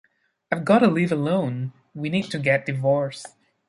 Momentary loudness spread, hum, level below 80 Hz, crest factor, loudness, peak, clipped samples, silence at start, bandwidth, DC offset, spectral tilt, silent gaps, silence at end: 15 LU; none; -64 dBFS; 18 dB; -22 LUFS; -4 dBFS; under 0.1%; 0.5 s; 11.5 kHz; under 0.1%; -7 dB/octave; none; 0.4 s